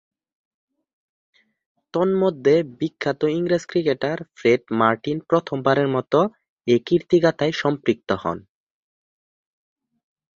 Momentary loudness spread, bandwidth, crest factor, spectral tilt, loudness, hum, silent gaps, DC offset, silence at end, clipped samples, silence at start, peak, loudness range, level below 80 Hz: 7 LU; 7.6 kHz; 20 dB; -6.5 dB/octave; -21 LUFS; none; 6.49-6.57 s; under 0.1%; 1.95 s; under 0.1%; 1.95 s; -2 dBFS; 4 LU; -60 dBFS